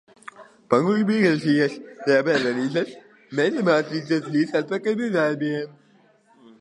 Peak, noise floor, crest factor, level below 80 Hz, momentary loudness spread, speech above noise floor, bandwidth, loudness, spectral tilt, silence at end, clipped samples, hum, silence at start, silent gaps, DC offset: -2 dBFS; -58 dBFS; 20 dB; -72 dBFS; 11 LU; 36 dB; 11 kHz; -22 LUFS; -6.5 dB/octave; 0.9 s; under 0.1%; none; 0.4 s; none; under 0.1%